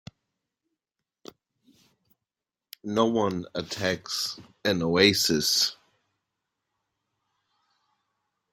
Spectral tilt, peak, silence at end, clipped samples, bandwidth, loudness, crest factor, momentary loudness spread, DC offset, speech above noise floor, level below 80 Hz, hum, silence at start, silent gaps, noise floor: -3 dB/octave; -4 dBFS; 2.8 s; under 0.1%; 16.5 kHz; -25 LUFS; 26 dB; 12 LU; under 0.1%; 63 dB; -64 dBFS; none; 2.85 s; none; -89 dBFS